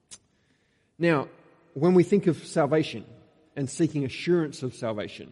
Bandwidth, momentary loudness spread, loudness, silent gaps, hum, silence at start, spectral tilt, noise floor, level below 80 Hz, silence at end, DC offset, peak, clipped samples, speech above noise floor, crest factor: 11.5 kHz; 14 LU; -26 LUFS; none; none; 0.1 s; -6.5 dB/octave; -68 dBFS; -68 dBFS; 0.05 s; under 0.1%; -8 dBFS; under 0.1%; 43 dB; 18 dB